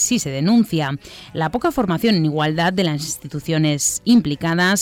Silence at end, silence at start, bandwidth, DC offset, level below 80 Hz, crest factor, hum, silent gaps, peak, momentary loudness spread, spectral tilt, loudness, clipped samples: 0 s; 0 s; 19.5 kHz; under 0.1%; -48 dBFS; 14 dB; none; none; -4 dBFS; 9 LU; -4.5 dB/octave; -19 LUFS; under 0.1%